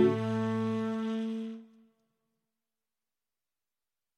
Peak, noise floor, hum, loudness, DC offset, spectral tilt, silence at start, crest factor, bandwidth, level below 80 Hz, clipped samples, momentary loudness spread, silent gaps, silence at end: -14 dBFS; under -90 dBFS; none; -33 LUFS; under 0.1%; -8 dB/octave; 0 s; 22 dB; 9 kHz; -80 dBFS; under 0.1%; 11 LU; none; 2.5 s